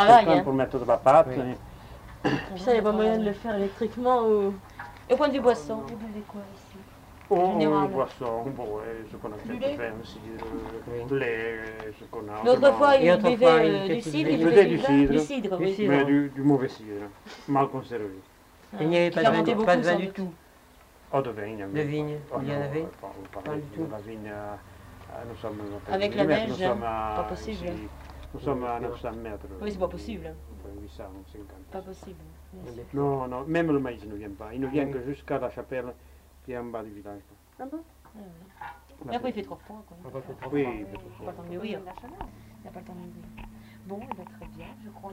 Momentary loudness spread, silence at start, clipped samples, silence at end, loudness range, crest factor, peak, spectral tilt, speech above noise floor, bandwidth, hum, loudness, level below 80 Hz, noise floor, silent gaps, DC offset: 23 LU; 0 s; under 0.1%; 0 s; 16 LU; 24 dB; -4 dBFS; -6.5 dB/octave; 28 dB; 16 kHz; none; -26 LUFS; -50 dBFS; -54 dBFS; none; under 0.1%